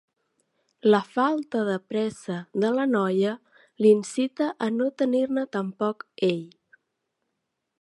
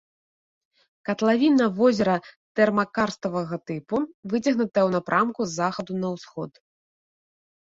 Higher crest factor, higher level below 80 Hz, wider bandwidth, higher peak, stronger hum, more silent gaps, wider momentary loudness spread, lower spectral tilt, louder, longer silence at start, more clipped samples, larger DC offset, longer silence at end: about the same, 18 dB vs 18 dB; second, -76 dBFS vs -64 dBFS; first, 11.5 kHz vs 7.8 kHz; about the same, -6 dBFS vs -6 dBFS; neither; second, none vs 2.36-2.55 s, 4.14-4.23 s; second, 8 LU vs 12 LU; about the same, -6 dB/octave vs -6 dB/octave; about the same, -25 LUFS vs -24 LUFS; second, 0.85 s vs 1.1 s; neither; neither; about the same, 1.35 s vs 1.3 s